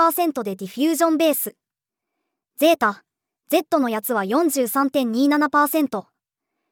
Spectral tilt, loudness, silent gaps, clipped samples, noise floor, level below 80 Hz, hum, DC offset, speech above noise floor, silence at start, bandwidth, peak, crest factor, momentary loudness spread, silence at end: -3.5 dB/octave; -20 LUFS; none; under 0.1%; -85 dBFS; -78 dBFS; none; under 0.1%; 65 dB; 0 s; over 20 kHz; -6 dBFS; 16 dB; 8 LU; 0.7 s